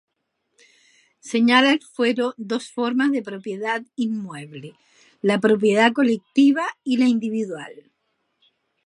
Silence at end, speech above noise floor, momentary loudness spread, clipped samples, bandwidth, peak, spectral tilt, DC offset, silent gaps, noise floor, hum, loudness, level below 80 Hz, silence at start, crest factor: 1.05 s; 55 dB; 15 LU; under 0.1%; 11.5 kHz; 0 dBFS; -5 dB/octave; under 0.1%; none; -75 dBFS; none; -20 LUFS; -74 dBFS; 1.25 s; 22 dB